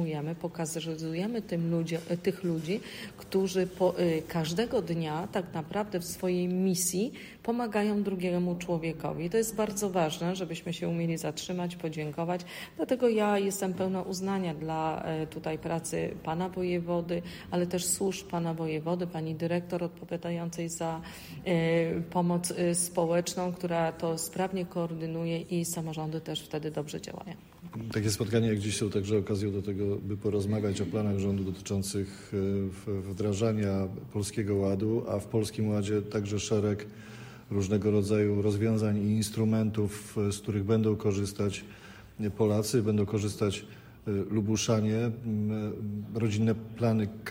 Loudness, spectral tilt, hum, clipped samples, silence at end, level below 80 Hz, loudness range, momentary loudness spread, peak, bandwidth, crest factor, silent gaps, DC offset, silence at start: -31 LUFS; -5.5 dB/octave; none; under 0.1%; 0 s; -60 dBFS; 4 LU; 8 LU; -14 dBFS; 16 kHz; 16 dB; none; under 0.1%; 0 s